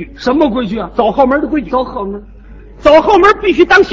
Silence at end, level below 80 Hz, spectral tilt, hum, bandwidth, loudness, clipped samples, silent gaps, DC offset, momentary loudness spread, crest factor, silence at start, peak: 0 s; -34 dBFS; -5.5 dB/octave; none; 8 kHz; -11 LUFS; 0.5%; none; under 0.1%; 12 LU; 12 dB; 0 s; 0 dBFS